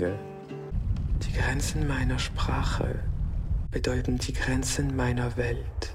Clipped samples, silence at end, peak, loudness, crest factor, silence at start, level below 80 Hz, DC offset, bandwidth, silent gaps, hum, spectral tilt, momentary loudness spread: under 0.1%; 0 s; -14 dBFS; -29 LUFS; 14 dB; 0 s; -32 dBFS; under 0.1%; 15 kHz; none; none; -5 dB/octave; 6 LU